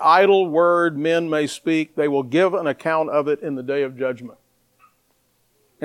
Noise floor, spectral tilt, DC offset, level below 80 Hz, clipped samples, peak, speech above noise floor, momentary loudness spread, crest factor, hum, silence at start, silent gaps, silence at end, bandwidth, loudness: -65 dBFS; -5.5 dB/octave; under 0.1%; -72 dBFS; under 0.1%; -4 dBFS; 46 dB; 9 LU; 16 dB; none; 0 s; none; 0 s; 12.5 kHz; -20 LUFS